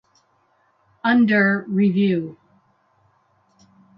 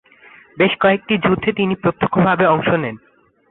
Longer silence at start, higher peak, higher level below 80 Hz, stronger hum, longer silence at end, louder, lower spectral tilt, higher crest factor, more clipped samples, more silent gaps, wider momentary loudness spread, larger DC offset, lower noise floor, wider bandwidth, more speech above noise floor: first, 1.05 s vs 0.55 s; second, -6 dBFS vs -2 dBFS; second, -68 dBFS vs -50 dBFS; neither; first, 1.65 s vs 0.55 s; about the same, -19 LUFS vs -17 LUFS; second, -9 dB/octave vs -11.5 dB/octave; about the same, 18 dB vs 14 dB; neither; neither; first, 10 LU vs 5 LU; neither; first, -63 dBFS vs -46 dBFS; first, 5.6 kHz vs 4.1 kHz; first, 45 dB vs 30 dB